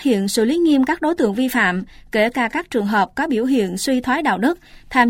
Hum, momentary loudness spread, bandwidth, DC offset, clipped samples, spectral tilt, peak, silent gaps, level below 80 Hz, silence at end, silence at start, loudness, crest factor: none; 5 LU; 16.5 kHz; under 0.1%; under 0.1%; -4.5 dB/octave; -2 dBFS; none; -48 dBFS; 0 s; 0 s; -18 LUFS; 16 dB